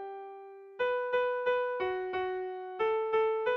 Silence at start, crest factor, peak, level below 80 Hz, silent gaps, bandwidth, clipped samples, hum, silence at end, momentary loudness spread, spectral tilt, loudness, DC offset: 0 s; 12 dB; -20 dBFS; -70 dBFS; none; 6 kHz; under 0.1%; none; 0 s; 15 LU; -5.5 dB/octave; -32 LUFS; under 0.1%